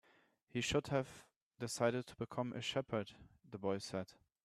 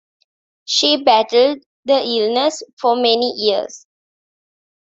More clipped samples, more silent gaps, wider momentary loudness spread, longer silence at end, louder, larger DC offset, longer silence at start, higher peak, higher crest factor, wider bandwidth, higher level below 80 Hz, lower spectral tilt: neither; second, 1.36-1.51 s vs 1.66-1.83 s, 2.73-2.77 s; first, 14 LU vs 8 LU; second, 0.35 s vs 1.05 s; second, -41 LUFS vs -16 LUFS; neither; second, 0.55 s vs 0.7 s; second, -20 dBFS vs 0 dBFS; about the same, 22 dB vs 18 dB; first, 13.5 kHz vs 8 kHz; about the same, -68 dBFS vs -66 dBFS; first, -4.5 dB/octave vs -2 dB/octave